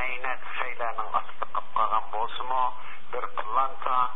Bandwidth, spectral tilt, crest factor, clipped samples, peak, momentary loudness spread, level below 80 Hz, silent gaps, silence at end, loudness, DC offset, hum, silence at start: 4 kHz; -7.5 dB/octave; 18 dB; under 0.1%; -10 dBFS; 7 LU; -68 dBFS; none; 0 s; -29 LUFS; 6%; none; 0 s